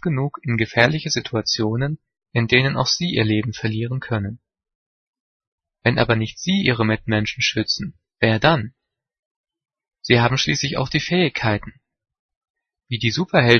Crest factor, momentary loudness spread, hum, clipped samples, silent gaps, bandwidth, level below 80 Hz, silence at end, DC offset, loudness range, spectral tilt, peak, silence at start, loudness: 22 dB; 9 LU; none; under 0.1%; 4.75-5.13 s, 5.20-5.40 s, 5.47-5.58 s, 9.19-9.44 s, 12.19-12.29 s, 12.36-12.41 s, 12.50-12.54 s; 6.6 kHz; -48 dBFS; 0 s; under 0.1%; 4 LU; -5 dB/octave; 0 dBFS; 0.05 s; -20 LUFS